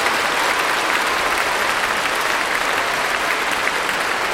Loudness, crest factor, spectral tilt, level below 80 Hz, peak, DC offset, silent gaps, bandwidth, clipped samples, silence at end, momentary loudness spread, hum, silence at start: -18 LUFS; 16 dB; -1 dB/octave; -48 dBFS; -4 dBFS; under 0.1%; none; 16.5 kHz; under 0.1%; 0 s; 2 LU; none; 0 s